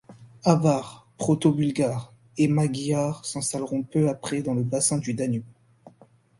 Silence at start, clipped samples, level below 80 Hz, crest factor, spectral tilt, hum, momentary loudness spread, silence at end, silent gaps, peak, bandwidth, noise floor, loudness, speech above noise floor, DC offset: 0.1 s; under 0.1%; -60 dBFS; 22 dB; -6 dB/octave; none; 7 LU; 0.5 s; none; -4 dBFS; 11.5 kHz; -57 dBFS; -25 LUFS; 33 dB; under 0.1%